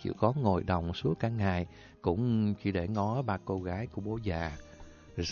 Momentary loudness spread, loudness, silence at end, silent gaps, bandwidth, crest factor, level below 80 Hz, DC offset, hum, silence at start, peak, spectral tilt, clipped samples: 8 LU; -32 LUFS; 0 s; none; 7 kHz; 20 dB; -46 dBFS; under 0.1%; none; 0 s; -12 dBFS; -7.5 dB/octave; under 0.1%